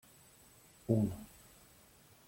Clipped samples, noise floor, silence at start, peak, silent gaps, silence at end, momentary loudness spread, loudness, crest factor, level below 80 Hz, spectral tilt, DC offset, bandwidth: under 0.1%; -63 dBFS; 0.9 s; -16 dBFS; none; 1 s; 26 LU; -35 LUFS; 24 dB; -64 dBFS; -8 dB/octave; under 0.1%; 16.5 kHz